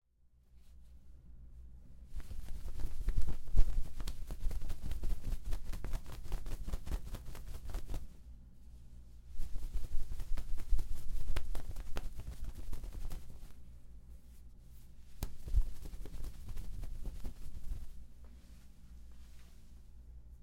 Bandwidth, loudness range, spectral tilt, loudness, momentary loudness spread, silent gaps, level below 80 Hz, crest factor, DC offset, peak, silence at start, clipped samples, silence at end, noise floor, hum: 12 kHz; 8 LU; -5.5 dB/octave; -46 LUFS; 18 LU; none; -40 dBFS; 22 dB; under 0.1%; -10 dBFS; 0.65 s; under 0.1%; 0.05 s; -66 dBFS; none